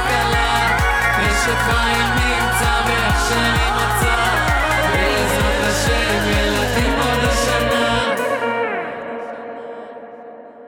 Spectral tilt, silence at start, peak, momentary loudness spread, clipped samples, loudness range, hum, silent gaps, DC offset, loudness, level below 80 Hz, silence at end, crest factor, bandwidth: -4 dB/octave; 0 s; -4 dBFS; 13 LU; under 0.1%; 3 LU; none; none; under 0.1%; -17 LUFS; -26 dBFS; 0 s; 12 dB; 18.5 kHz